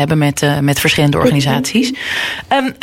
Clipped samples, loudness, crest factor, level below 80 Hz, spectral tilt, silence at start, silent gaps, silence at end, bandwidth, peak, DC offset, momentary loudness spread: under 0.1%; -14 LUFS; 12 dB; -40 dBFS; -5 dB/octave; 0 s; none; 0.1 s; 16.5 kHz; 0 dBFS; under 0.1%; 5 LU